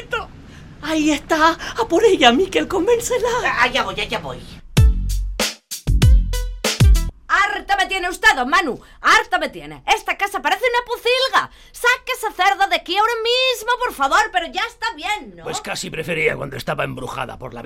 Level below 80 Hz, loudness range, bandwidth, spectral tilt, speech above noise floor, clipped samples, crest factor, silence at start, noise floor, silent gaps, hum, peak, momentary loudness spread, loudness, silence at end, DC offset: -26 dBFS; 3 LU; 16.5 kHz; -4 dB/octave; 20 dB; under 0.1%; 18 dB; 0 s; -39 dBFS; none; none; 0 dBFS; 12 LU; -18 LUFS; 0 s; under 0.1%